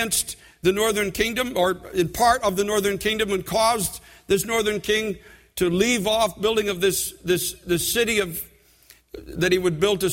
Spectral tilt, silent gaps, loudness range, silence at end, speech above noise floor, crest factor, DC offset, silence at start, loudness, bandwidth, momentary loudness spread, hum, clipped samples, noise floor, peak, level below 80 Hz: -3.5 dB/octave; none; 2 LU; 0 s; 32 dB; 18 dB; under 0.1%; 0 s; -22 LUFS; 16.5 kHz; 9 LU; none; under 0.1%; -54 dBFS; -6 dBFS; -46 dBFS